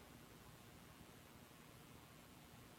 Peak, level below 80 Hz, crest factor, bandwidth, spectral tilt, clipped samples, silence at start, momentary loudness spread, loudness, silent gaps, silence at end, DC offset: -46 dBFS; -74 dBFS; 16 dB; 17 kHz; -4 dB/octave; under 0.1%; 0 s; 1 LU; -62 LUFS; none; 0 s; under 0.1%